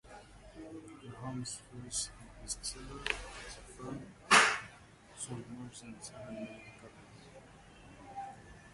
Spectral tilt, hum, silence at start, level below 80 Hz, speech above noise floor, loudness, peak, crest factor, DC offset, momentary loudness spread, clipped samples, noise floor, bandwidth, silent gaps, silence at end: -2 dB/octave; none; 0.05 s; -58 dBFS; 13 dB; -35 LUFS; -10 dBFS; 30 dB; under 0.1%; 24 LU; under 0.1%; -57 dBFS; 11.5 kHz; none; 0 s